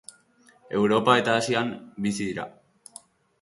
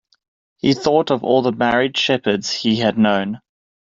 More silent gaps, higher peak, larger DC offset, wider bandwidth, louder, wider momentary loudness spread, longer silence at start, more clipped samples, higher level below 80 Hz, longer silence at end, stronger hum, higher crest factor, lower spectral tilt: neither; about the same, -4 dBFS vs -2 dBFS; neither; first, 11.5 kHz vs 7.6 kHz; second, -24 LUFS vs -18 LUFS; first, 24 LU vs 5 LU; about the same, 0.7 s vs 0.65 s; neither; second, -64 dBFS vs -56 dBFS; first, 0.9 s vs 0.5 s; neither; first, 22 dB vs 16 dB; about the same, -4.5 dB/octave vs -5 dB/octave